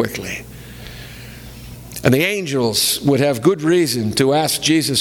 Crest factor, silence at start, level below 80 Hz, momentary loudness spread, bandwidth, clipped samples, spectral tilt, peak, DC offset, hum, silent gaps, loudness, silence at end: 18 dB; 0 s; -44 dBFS; 20 LU; 19.5 kHz; under 0.1%; -4 dB/octave; 0 dBFS; under 0.1%; none; none; -16 LUFS; 0 s